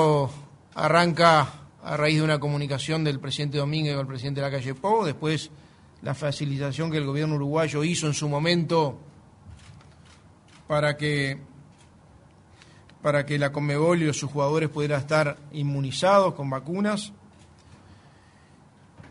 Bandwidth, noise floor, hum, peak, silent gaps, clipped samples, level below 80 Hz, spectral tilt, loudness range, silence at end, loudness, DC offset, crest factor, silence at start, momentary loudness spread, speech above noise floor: 11 kHz; -54 dBFS; none; -2 dBFS; none; under 0.1%; -60 dBFS; -5.5 dB/octave; 6 LU; 0 s; -25 LUFS; under 0.1%; 24 dB; 0 s; 11 LU; 30 dB